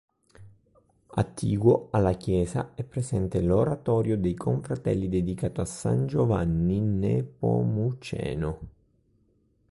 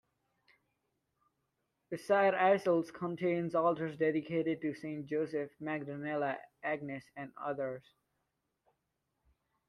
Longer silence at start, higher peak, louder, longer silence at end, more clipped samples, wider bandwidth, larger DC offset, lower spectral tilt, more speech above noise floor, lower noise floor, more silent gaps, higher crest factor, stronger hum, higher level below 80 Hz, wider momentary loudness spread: second, 0.4 s vs 1.9 s; first, -8 dBFS vs -16 dBFS; first, -27 LUFS vs -34 LUFS; second, 1 s vs 1.9 s; neither; about the same, 11.5 kHz vs 12.5 kHz; neither; about the same, -8 dB/octave vs -7 dB/octave; second, 41 dB vs 50 dB; second, -67 dBFS vs -84 dBFS; neither; about the same, 18 dB vs 20 dB; neither; first, -44 dBFS vs -80 dBFS; second, 8 LU vs 13 LU